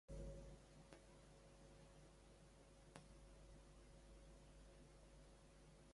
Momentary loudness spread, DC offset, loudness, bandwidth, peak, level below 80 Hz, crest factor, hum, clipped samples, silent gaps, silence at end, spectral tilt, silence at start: 8 LU; under 0.1%; -65 LUFS; 11.5 kHz; -38 dBFS; -66 dBFS; 24 dB; none; under 0.1%; none; 0 s; -5.5 dB/octave; 0.1 s